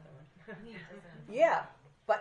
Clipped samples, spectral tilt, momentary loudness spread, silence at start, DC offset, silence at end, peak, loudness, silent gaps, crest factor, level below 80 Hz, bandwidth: under 0.1%; -5 dB/octave; 23 LU; 0.15 s; under 0.1%; 0 s; -14 dBFS; -31 LUFS; none; 20 dB; -72 dBFS; 7.8 kHz